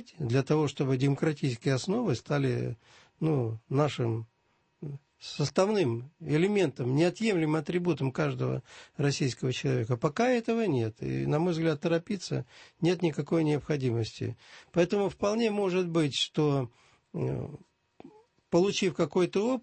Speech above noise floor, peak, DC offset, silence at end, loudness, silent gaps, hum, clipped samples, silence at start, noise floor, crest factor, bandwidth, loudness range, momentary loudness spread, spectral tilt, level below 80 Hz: 43 dB; -12 dBFS; under 0.1%; 0.05 s; -29 LUFS; none; none; under 0.1%; 0 s; -71 dBFS; 16 dB; 8.8 kHz; 2 LU; 11 LU; -6.5 dB/octave; -62 dBFS